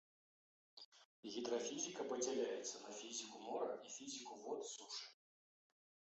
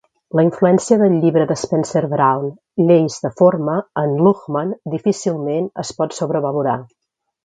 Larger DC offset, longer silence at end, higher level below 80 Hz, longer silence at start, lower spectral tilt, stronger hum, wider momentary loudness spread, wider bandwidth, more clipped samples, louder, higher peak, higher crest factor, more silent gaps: neither; first, 1 s vs 0.6 s; second, under -90 dBFS vs -60 dBFS; first, 0.75 s vs 0.35 s; second, -1.5 dB/octave vs -7 dB/octave; neither; first, 17 LU vs 9 LU; second, 8.2 kHz vs 9.4 kHz; neither; second, -47 LUFS vs -17 LUFS; second, -30 dBFS vs 0 dBFS; about the same, 18 dB vs 16 dB; first, 0.85-0.92 s, 1.05-1.23 s vs none